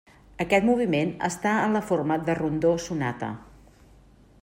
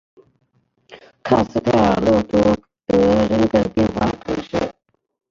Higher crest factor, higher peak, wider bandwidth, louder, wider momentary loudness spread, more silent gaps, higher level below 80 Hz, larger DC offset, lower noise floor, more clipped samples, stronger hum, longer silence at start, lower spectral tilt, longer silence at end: about the same, 18 dB vs 16 dB; second, -8 dBFS vs -2 dBFS; first, 16 kHz vs 7.6 kHz; second, -25 LUFS vs -18 LUFS; about the same, 11 LU vs 9 LU; neither; second, -54 dBFS vs -40 dBFS; neither; second, -54 dBFS vs -60 dBFS; neither; neither; second, 0.4 s vs 0.9 s; about the same, -6 dB/octave vs -7 dB/octave; first, 1 s vs 0.6 s